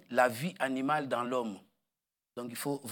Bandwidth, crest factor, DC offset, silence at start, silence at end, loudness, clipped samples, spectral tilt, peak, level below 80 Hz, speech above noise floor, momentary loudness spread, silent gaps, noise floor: 18 kHz; 22 dB; under 0.1%; 0.1 s; 0 s; -33 LUFS; under 0.1%; -5 dB/octave; -12 dBFS; -88 dBFS; 57 dB; 15 LU; none; -90 dBFS